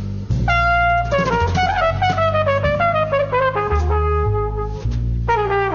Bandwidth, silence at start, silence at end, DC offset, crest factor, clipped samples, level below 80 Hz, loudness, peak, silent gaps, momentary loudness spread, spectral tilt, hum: 7.2 kHz; 0 s; 0 s; under 0.1%; 12 dB; under 0.1%; -26 dBFS; -18 LUFS; -4 dBFS; none; 6 LU; -6.5 dB/octave; none